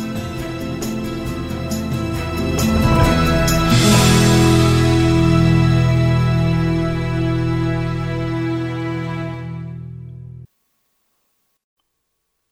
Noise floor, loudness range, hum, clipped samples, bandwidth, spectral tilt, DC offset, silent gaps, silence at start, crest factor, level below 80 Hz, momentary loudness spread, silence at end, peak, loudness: -72 dBFS; 15 LU; none; under 0.1%; 16 kHz; -5.5 dB/octave; under 0.1%; none; 0 s; 16 dB; -30 dBFS; 14 LU; 2.05 s; -2 dBFS; -17 LUFS